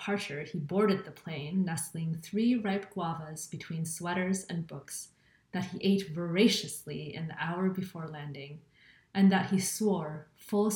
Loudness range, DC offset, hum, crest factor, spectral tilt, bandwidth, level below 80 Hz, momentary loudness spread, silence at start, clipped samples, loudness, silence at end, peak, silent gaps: 3 LU; under 0.1%; none; 20 dB; -5 dB/octave; 18 kHz; -70 dBFS; 14 LU; 0 s; under 0.1%; -32 LUFS; 0 s; -12 dBFS; none